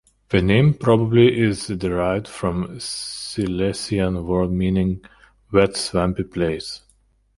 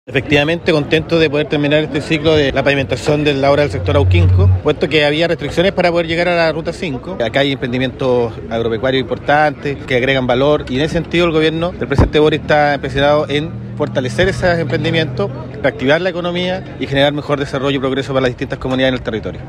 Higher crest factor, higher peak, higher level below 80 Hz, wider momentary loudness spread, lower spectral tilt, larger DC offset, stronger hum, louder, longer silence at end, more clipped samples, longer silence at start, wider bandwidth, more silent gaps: first, 20 dB vs 14 dB; about the same, 0 dBFS vs 0 dBFS; second, -40 dBFS vs -34 dBFS; first, 12 LU vs 7 LU; about the same, -6 dB/octave vs -6.5 dB/octave; neither; neither; second, -20 LUFS vs -15 LUFS; first, 0.6 s vs 0 s; neither; first, 0.3 s vs 0.1 s; about the same, 11.5 kHz vs 10.5 kHz; neither